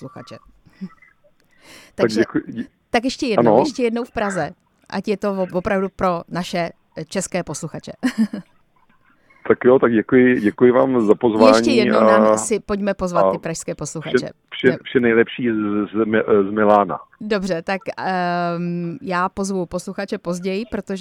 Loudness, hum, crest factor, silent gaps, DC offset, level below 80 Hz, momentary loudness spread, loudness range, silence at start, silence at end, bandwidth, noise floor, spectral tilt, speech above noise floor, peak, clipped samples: -19 LUFS; none; 18 dB; none; under 0.1%; -50 dBFS; 14 LU; 8 LU; 0 s; 0 s; 13.5 kHz; -57 dBFS; -5.5 dB/octave; 38 dB; 0 dBFS; under 0.1%